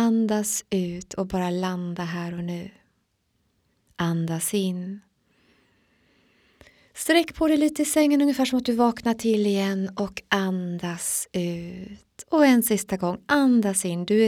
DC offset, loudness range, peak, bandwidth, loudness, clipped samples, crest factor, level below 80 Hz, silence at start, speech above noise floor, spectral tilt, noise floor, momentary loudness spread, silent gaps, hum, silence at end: under 0.1%; 8 LU; -4 dBFS; 18 kHz; -24 LUFS; under 0.1%; 20 dB; -56 dBFS; 0 s; 48 dB; -4.5 dB/octave; -71 dBFS; 13 LU; none; none; 0 s